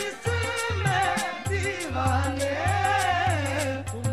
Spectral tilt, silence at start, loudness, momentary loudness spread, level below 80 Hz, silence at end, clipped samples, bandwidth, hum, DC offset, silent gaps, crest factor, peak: -4.5 dB/octave; 0 s; -26 LUFS; 5 LU; -46 dBFS; 0 s; under 0.1%; 15.5 kHz; none; 0.3%; none; 16 dB; -10 dBFS